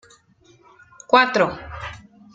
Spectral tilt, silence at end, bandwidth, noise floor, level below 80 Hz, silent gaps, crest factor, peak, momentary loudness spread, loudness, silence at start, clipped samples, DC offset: -4.5 dB/octave; 0.4 s; 7.8 kHz; -55 dBFS; -50 dBFS; none; 22 dB; -2 dBFS; 19 LU; -18 LUFS; 1.1 s; under 0.1%; under 0.1%